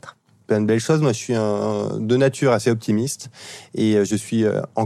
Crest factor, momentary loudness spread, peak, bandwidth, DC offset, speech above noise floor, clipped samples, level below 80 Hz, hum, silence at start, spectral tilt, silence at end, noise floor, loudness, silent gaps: 14 dB; 8 LU; -6 dBFS; 13.5 kHz; under 0.1%; 24 dB; under 0.1%; -64 dBFS; none; 0.05 s; -6 dB/octave; 0 s; -44 dBFS; -20 LUFS; none